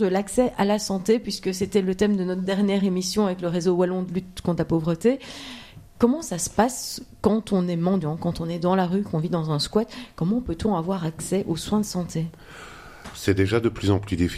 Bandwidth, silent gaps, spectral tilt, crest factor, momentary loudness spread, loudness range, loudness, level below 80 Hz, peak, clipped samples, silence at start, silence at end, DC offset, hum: 15.5 kHz; none; -6 dB/octave; 20 dB; 9 LU; 3 LU; -24 LUFS; -48 dBFS; -4 dBFS; under 0.1%; 0 s; 0 s; under 0.1%; none